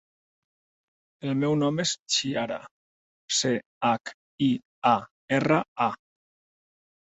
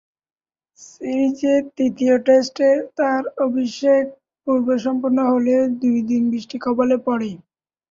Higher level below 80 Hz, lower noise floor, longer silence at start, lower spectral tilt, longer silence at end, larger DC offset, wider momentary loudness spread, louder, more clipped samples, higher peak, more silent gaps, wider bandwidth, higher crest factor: about the same, -68 dBFS vs -64 dBFS; about the same, under -90 dBFS vs under -90 dBFS; first, 1.25 s vs 0.8 s; second, -4 dB/octave vs -5.5 dB/octave; first, 1.05 s vs 0.55 s; neither; about the same, 8 LU vs 8 LU; second, -26 LUFS vs -19 LUFS; neither; about the same, -6 dBFS vs -4 dBFS; first, 2.00-2.06 s, 2.71-3.28 s, 3.66-3.81 s, 4.14-4.38 s, 4.65-4.82 s, 5.11-5.28 s, 5.68-5.76 s vs none; first, 8.4 kHz vs 7.6 kHz; first, 22 dB vs 16 dB